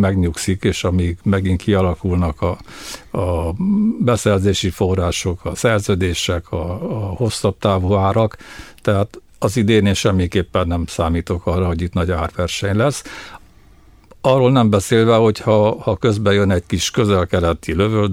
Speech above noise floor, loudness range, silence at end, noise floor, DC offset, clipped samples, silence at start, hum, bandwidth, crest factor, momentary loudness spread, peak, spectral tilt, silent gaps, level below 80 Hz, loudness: 30 dB; 4 LU; 0 s; -46 dBFS; under 0.1%; under 0.1%; 0 s; none; 15.5 kHz; 16 dB; 9 LU; -2 dBFS; -6 dB/octave; none; -34 dBFS; -17 LUFS